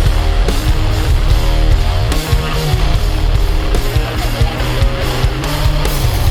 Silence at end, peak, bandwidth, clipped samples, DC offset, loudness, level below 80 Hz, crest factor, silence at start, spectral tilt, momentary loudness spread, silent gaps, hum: 0 s; 0 dBFS; 18 kHz; under 0.1%; under 0.1%; -16 LUFS; -14 dBFS; 12 dB; 0 s; -5 dB/octave; 2 LU; none; none